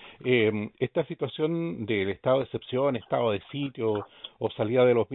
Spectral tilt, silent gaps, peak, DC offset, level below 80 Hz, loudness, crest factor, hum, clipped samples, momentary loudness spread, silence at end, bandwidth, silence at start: -10.5 dB/octave; none; -10 dBFS; under 0.1%; -66 dBFS; -28 LUFS; 16 dB; none; under 0.1%; 9 LU; 0 s; 4.1 kHz; 0 s